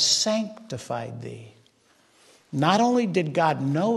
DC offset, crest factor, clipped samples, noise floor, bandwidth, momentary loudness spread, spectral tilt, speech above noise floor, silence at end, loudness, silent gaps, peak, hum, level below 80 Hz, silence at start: under 0.1%; 18 dB; under 0.1%; -61 dBFS; 12.5 kHz; 17 LU; -4 dB/octave; 37 dB; 0 s; -24 LUFS; none; -8 dBFS; none; -68 dBFS; 0 s